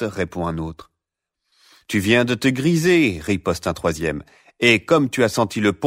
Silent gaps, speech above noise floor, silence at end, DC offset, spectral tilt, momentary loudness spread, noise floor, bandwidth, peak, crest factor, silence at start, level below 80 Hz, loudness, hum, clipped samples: none; 63 dB; 0 s; under 0.1%; -5 dB/octave; 10 LU; -82 dBFS; 16 kHz; -2 dBFS; 18 dB; 0 s; -46 dBFS; -19 LUFS; none; under 0.1%